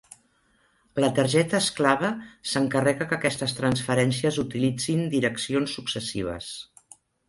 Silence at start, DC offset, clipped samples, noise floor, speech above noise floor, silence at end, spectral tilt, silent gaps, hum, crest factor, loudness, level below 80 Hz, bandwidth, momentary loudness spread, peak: 0.95 s; under 0.1%; under 0.1%; -65 dBFS; 40 dB; 0.65 s; -4.5 dB/octave; none; none; 20 dB; -25 LUFS; -56 dBFS; 11.5 kHz; 10 LU; -6 dBFS